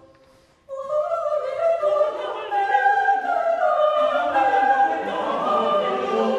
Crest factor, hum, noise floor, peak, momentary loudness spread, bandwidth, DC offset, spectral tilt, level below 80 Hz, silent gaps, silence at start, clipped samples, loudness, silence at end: 14 dB; none; -55 dBFS; -6 dBFS; 7 LU; 9.8 kHz; under 0.1%; -4.5 dB/octave; -66 dBFS; none; 0.7 s; under 0.1%; -21 LUFS; 0 s